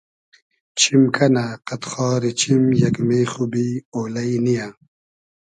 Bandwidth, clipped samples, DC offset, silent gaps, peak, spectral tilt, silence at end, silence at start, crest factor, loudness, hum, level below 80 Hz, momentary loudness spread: 10.5 kHz; under 0.1%; under 0.1%; 3.85-3.92 s; -2 dBFS; -5 dB/octave; 0.8 s; 0.75 s; 18 dB; -19 LUFS; none; -58 dBFS; 12 LU